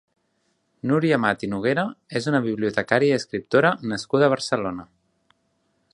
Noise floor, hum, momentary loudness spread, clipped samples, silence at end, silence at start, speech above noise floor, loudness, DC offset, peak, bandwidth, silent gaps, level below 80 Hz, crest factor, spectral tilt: -70 dBFS; none; 8 LU; under 0.1%; 1.1 s; 0.85 s; 48 dB; -22 LUFS; under 0.1%; -2 dBFS; 11 kHz; none; -60 dBFS; 22 dB; -6 dB/octave